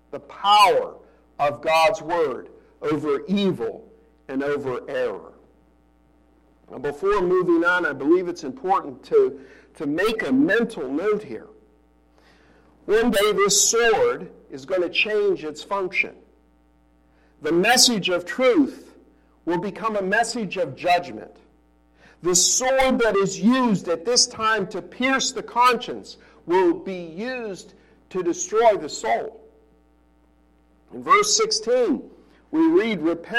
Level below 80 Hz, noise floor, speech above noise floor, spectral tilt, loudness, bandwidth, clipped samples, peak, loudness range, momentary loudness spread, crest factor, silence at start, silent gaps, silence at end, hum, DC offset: -54 dBFS; -59 dBFS; 37 dB; -3 dB/octave; -21 LUFS; 16.5 kHz; under 0.1%; -4 dBFS; 6 LU; 15 LU; 20 dB; 0.15 s; none; 0 s; none; under 0.1%